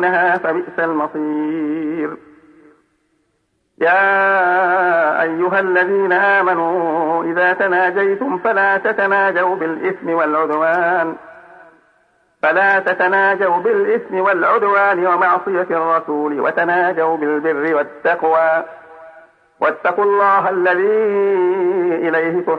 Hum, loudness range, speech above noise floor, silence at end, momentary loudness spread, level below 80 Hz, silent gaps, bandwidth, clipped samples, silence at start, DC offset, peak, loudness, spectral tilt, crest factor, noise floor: none; 4 LU; 50 dB; 0 s; 7 LU; -70 dBFS; none; 5.4 kHz; under 0.1%; 0 s; under 0.1%; -4 dBFS; -16 LUFS; -7.5 dB/octave; 12 dB; -66 dBFS